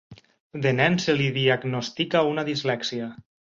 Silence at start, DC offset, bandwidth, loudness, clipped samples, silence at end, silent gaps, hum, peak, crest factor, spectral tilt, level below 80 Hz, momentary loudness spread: 0.1 s; under 0.1%; 7.6 kHz; -24 LUFS; under 0.1%; 0.45 s; 0.40-0.50 s; none; -6 dBFS; 20 dB; -5.5 dB/octave; -62 dBFS; 10 LU